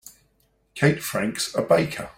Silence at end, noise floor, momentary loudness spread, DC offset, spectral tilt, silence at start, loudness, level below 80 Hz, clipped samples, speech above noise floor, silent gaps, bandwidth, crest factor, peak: 0.05 s; -66 dBFS; 5 LU; under 0.1%; -5 dB/octave; 0.05 s; -23 LUFS; -58 dBFS; under 0.1%; 43 dB; none; 16.5 kHz; 20 dB; -4 dBFS